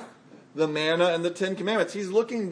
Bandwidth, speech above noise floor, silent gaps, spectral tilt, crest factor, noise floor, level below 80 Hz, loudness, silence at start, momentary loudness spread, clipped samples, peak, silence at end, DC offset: 10.5 kHz; 24 dB; none; -5 dB/octave; 18 dB; -50 dBFS; -82 dBFS; -26 LUFS; 0 s; 6 LU; under 0.1%; -8 dBFS; 0 s; under 0.1%